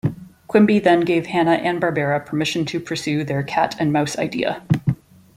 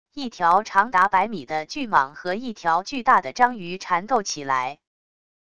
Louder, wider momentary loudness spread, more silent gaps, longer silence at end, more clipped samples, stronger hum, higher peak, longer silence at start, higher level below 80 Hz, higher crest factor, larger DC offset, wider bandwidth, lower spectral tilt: about the same, -20 LUFS vs -22 LUFS; about the same, 9 LU vs 10 LU; neither; second, 0.4 s vs 0.75 s; neither; neither; about the same, -2 dBFS vs -2 dBFS; about the same, 0.05 s vs 0.15 s; first, -54 dBFS vs -60 dBFS; about the same, 18 dB vs 20 dB; second, under 0.1% vs 0.5%; first, 15 kHz vs 11 kHz; first, -6 dB/octave vs -3.5 dB/octave